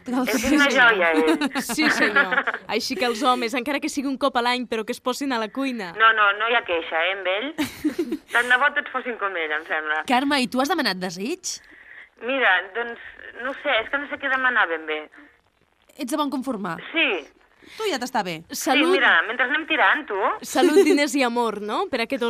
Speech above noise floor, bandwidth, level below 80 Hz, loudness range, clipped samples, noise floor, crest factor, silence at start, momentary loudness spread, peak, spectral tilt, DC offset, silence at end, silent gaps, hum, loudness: 41 dB; 15.5 kHz; -60 dBFS; 6 LU; under 0.1%; -63 dBFS; 18 dB; 0.05 s; 12 LU; -4 dBFS; -2.5 dB/octave; under 0.1%; 0 s; none; none; -21 LUFS